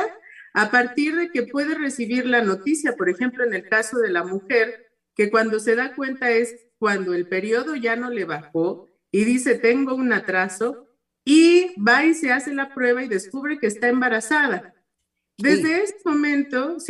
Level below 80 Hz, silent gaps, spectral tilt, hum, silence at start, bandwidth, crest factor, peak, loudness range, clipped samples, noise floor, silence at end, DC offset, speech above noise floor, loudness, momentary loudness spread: -70 dBFS; none; -4 dB/octave; none; 0 s; 12.5 kHz; 18 dB; -4 dBFS; 4 LU; under 0.1%; -78 dBFS; 0 s; under 0.1%; 57 dB; -21 LUFS; 9 LU